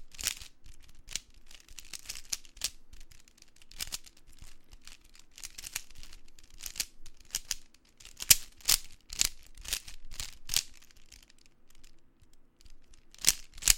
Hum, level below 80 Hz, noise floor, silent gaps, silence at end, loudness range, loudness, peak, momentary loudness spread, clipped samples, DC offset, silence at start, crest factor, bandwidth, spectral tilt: none; -50 dBFS; -57 dBFS; none; 0 s; 14 LU; -32 LUFS; 0 dBFS; 24 LU; under 0.1%; under 0.1%; 0 s; 36 dB; 17 kHz; 1.5 dB/octave